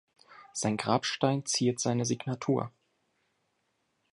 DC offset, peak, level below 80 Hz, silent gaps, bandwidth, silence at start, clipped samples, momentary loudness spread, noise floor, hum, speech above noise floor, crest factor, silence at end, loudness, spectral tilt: under 0.1%; -10 dBFS; -70 dBFS; none; 11.5 kHz; 0.3 s; under 0.1%; 5 LU; -77 dBFS; none; 47 dB; 22 dB; 1.45 s; -30 LUFS; -4.5 dB/octave